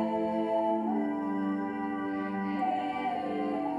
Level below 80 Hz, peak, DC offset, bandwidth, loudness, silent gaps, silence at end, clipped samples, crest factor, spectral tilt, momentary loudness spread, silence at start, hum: -70 dBFS; -18 dBFS; under 0.1%; 10 kHz; -31 LUFS; none; 0 s; under 0.1%; 12 dB; -8 dB/octave; 4 LU; 0 s; none